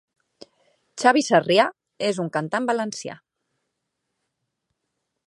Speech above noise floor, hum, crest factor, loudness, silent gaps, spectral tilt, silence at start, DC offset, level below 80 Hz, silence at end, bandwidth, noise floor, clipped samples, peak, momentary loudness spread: 58 dB; none; 22 dB; -21 LUFS; none; -4 dB/octave; 0.95 s; under 0.1%; -76 dBFS; 2.1 s; 11.5 kHz; -79 dBFS; under 0.1%; -2 dBFS; 15 LU